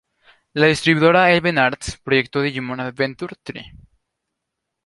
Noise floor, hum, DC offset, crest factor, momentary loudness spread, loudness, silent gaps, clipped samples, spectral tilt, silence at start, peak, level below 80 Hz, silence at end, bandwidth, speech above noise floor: -80 dBFS; none; under 0.1%; 18 dB; 17 LU; -17 LUFS; none; under 0.1%; -5 dB/octave; 0.55 s; -2 dBFS; -48 dBFS; 1.15 s; 11.5 kHz; 61 dB